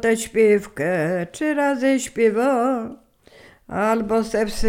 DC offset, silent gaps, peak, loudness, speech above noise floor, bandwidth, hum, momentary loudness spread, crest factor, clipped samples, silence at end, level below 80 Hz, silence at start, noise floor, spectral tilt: under 0.1%; none; -6 dBFS; -20 LUFS; 30 dB; 16 kHz; none; 6 LU; 14 dB; under 0.1%; 0 s; -42 dBFS; 0 s; -50 dBFS; -5 dB/octave